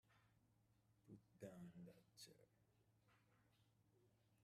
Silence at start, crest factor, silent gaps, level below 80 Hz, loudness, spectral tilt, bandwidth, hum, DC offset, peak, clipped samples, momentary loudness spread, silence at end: 0.05 s; 24 dB; none; under -90 dBFS; -64 LUFS; -5 dB/octave; 14.5 kHz; none; under 0.1%; -44 dBFS; under 0.1%; 9 LU; 0 s